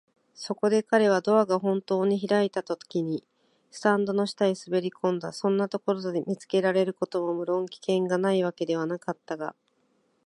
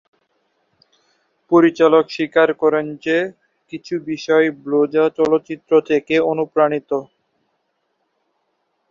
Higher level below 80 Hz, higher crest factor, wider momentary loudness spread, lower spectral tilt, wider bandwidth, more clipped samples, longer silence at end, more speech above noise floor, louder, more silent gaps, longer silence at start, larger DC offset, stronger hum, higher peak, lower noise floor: second, -78 dBFS vs -64 dBFS; about the same, 20 dB vs 18 dB; about the same, 11 LU vs 11 LU; about the same, -6 dB/octave vs -6 dB/octave; first, 11.5 kHz vs 7.2 kHz; neither; second, 0.75 s vs 1.85 s; second, 44 dB vs 53 dB; second, -27 LUFS vs -17 LUFS; neither; second, 0.4 s vs 1.5 s; neither; neither; second, -8 dBFS vs -2 dBFS; about the same, -70 dBFS vs -70 dBFS